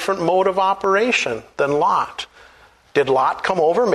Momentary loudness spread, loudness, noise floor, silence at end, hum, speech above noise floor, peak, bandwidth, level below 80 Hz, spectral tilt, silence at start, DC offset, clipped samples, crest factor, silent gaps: 8 LU; -18 LUFS; -49 dBFS; 0 s; none; 32 dB; -4 dBFS; 13 kHz; -56 dBFS; -4.5 dB/octave; 0 s; under 0.1%; under 0.1%; 14 dB; none